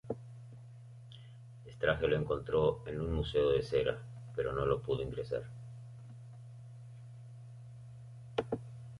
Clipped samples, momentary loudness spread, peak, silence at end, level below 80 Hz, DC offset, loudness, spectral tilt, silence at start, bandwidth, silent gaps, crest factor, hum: under 0.1%; 21 LU; -16 dBFS; 0 s; -52 dBFS; under 0.1%; -35 LUFS; -7.5 dB/octave; 0.05 s; 11.5 kHz; none; 22 dB; none